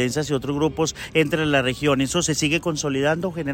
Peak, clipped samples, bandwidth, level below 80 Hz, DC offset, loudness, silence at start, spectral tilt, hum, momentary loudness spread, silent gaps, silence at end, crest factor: -6 dBFS; under 0.1%; 16.5 kHz; -46 dBFS; under 0.1%; -22 LUFS; 0 s; -4.5 dB/octave; none; 4 LU; none; 0 s; 16 dB